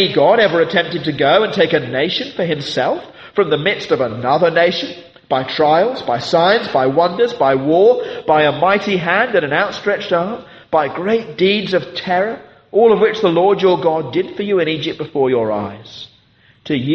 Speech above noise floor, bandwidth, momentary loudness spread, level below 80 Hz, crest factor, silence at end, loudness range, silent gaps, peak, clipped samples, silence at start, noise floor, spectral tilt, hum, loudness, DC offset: 37 dB; 7.8 kHz; 9 LU; -56 dBFS; 14 dB; 0 s; 3 LU; none; 0 dBFS; under 0.1%; 0 s; -52 dBFS; -6 dB/octave; none; -15 LUFS; under 0.1%